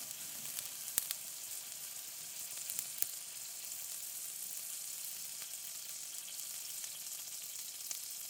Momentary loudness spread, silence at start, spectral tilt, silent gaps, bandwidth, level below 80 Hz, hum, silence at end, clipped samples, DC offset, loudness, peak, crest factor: 6 LU; 0 s; 2 dB/octave; none; 19 kHz; under -90 dBFS; none; 0 s; under 0.1%; under 0.1%; -41 LUFS; -6 dBFS; 38 dB